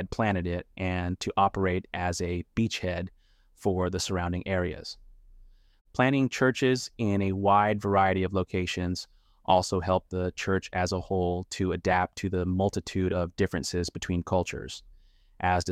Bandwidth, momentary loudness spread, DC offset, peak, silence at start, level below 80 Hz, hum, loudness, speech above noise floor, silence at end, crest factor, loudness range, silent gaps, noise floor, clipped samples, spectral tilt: 14.5 kHz; 9 LU; under 0.1%; -8 dBFS; 0 s; -50 dBFS; none; -28 LUFS; 29 dB; 0 s; 20 dB; 5 LU; 5.81-5.85 s; -57 dBFS; under 0.1%; -5.5 dB/octave